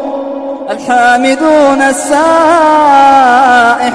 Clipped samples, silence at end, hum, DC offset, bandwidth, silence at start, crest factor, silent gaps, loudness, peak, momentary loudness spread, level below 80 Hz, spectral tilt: 0.6%; 0 s; none; under 0.1%; 11 kHz; 0 s; 8 dB; none; -7 LUFS; 0 dBFS; 13 LU; -46 dBFS; -3 dB/octave